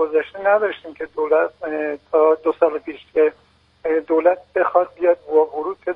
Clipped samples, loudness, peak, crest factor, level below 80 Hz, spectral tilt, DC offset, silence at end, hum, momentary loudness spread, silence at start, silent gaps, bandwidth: under 0.1%; -19 LUFS; -2 dBFS; 18 dB; -62 dBFS; -7 dB/octave; under 0.1%; 0 s; none; 8 LU; 0 s; none; 4.6 kHz